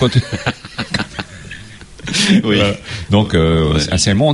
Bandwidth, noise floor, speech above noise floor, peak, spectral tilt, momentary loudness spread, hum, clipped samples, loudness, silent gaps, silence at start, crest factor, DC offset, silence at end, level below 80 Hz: 11.5 kHz; -35 dBFS; 21 dB; 0 dBFS; -5 dB/octave; 18 LU; none; under 0.1%; -15 LUFS; none; 0 s; 14 dB; under 0.1%; 0 s; -32 dBFS